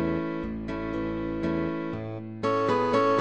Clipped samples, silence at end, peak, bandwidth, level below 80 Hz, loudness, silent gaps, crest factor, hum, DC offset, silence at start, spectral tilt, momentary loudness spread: under 0.1%; 0 s; -12 dBFS; 8.8 kHz; -48 dBFS; -29 LUFS; none; 16 dB; none; 0.3%; 0 s; -7.5 dB/octave; 10 LU